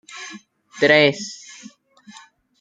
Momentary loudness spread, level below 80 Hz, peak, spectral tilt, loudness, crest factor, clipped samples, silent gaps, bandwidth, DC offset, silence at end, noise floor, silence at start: 23 LU; -66 dBFS; -2 dBFS; -4 dB/octave; -16 LUFS; 22 dB; under 0.1%; none; 9.2 kHz; under 0.1%; 1.25 s; -48 dBFS; 0.15 s